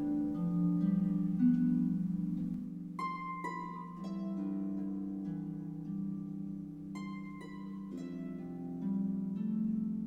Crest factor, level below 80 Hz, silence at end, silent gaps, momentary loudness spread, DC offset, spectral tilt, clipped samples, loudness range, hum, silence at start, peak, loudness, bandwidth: 16 dB; -64 dBFS; 0 s; none; 12 LU; under 0.1%; -9.5 dB/octave; under 0.1%; 9 LU; none; 0 s; -20 dBFS; -37 LUFS; 7.8 kHz